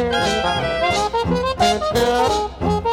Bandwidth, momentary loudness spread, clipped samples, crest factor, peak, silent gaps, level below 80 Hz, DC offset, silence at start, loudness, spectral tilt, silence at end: 16.5 kHz; 4 LU; under 0.1%; 14 dB; -6 dBFS; none; -36 dBFS; under 0.1%; 0 s; -19 LUFS; -4.5 dB/octave; 0 s